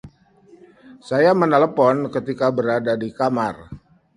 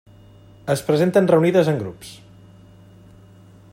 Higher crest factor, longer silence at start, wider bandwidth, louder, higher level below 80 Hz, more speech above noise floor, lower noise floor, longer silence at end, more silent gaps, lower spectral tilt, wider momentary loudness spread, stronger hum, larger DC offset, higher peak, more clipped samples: about the same, 20 dB vs 18 dB; second, 0.05 s vs 0.65 s; second, 11 kHz vs 16 kHz; about the same, -19 LUFS vs -18 LUFS; about the same, -56 dBFS vs -58 dBFS; first, 33 dB vs 29 dB; first, -51 dBFS vs -47 dBFS; second, 0.4 s vs 1.6 s; neither; about the same, -7.5 dB/octave vs -7 dB/octave; second, 9 LU vs 20 LU; second, none vs 50 Hz at -45 dBFS; neither; about the same, -2 dBFS vs -2 dBFS; neither